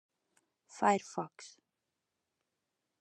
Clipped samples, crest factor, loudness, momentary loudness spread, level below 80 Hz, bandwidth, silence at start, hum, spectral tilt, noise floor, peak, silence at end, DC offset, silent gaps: under 0.1%; 24 dB; -34 LUFS; 23 LU; under -90 dBFS; 9.8 kHz; 0.75 s; none; -4.5 dB/octave; -87 dBFS; -14 dBFS; 1.55 s; under 0.1%; none